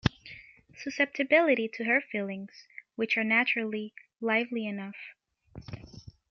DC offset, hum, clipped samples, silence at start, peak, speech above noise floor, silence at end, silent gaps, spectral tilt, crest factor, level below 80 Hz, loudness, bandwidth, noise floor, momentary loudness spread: under 0.1%; none; under 0.1%; 0.05 s; -8 dBFS; 22 dB; 0.2 s; none; -6 dB/octave; 24 dB; -58 dBFS; -28 LUFS; 7.2 kHz; -51 dBFS; 23 LU